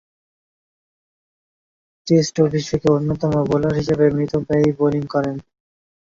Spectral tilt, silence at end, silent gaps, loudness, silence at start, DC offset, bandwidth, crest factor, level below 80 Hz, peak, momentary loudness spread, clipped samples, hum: -7 dB/octave; 0.75 s; none; -19 LUFS; 2.05 s; under 0.1%; 7.6 kHz; 18 dB; -48 dBFS; -2 dBFS; 5 LU; under 0.1%; none